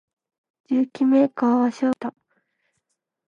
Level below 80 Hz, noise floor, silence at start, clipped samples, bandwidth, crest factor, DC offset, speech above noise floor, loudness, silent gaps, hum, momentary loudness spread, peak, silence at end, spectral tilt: -76 dBFS; -77 dBFS; 0.7 s; under 0.1%; 7.4 kHz; 16 dB; under 0.1%; 57 dB; -21 LUFS; none; none; 9 LU; -6 dBFS; 1.2 s; -6.5 dB/octave